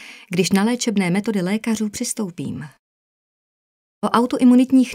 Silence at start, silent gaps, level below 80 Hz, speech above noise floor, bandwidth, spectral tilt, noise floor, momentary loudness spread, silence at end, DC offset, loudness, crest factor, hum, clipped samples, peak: 0 s; 2.79-4.02 s; -60 dBFS; over 72 dB; 16 kHz; -5 dB/octave; under -90 dBFS; 14 LU; 0 s; under 0.1%; -19 LUFS; 16 dB; none; under 0.1%; -2 dBFS